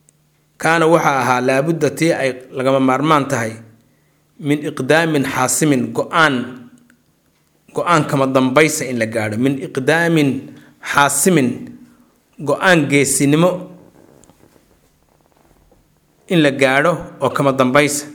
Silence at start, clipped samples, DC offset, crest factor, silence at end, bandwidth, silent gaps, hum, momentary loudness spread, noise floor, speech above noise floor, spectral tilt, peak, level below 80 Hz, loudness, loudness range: 0.6 s; under 0.1%; under 0.1%; 16 dB; 0 s; 19.5 kHz; none; none; 9 LU; -59 dBFS; 44 dB; -4.5 dB/octave; 0 dBFS; -58 dBFS; -15 LUFS; 4 LU